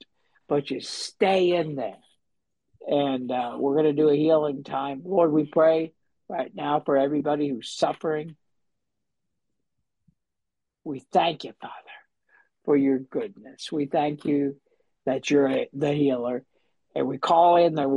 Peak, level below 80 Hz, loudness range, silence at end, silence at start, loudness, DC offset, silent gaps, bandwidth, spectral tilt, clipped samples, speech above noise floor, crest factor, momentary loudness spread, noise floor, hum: -8 dBFS; -72 dBFS; 9 LU; 0 s; 0.5 s; -24 LUFS; under 0.1%; none; 11 kHz; -6 dB/octave; under 0.1%; 63 dB; 18 dB; 15 LU; -86 dBFS; none